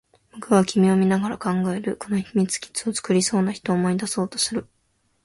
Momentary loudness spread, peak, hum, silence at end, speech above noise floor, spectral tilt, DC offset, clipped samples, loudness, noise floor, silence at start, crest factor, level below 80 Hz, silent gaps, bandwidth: 8 LU; -4 dBFS; none; 0.6 s; 46 dB; -5 dB/octave; under 0.1%; under 0.1%; -22 LUFS; -67 dBFS; 0.35 s; 18 dB; -60 dBFS; none; 11.5 kHz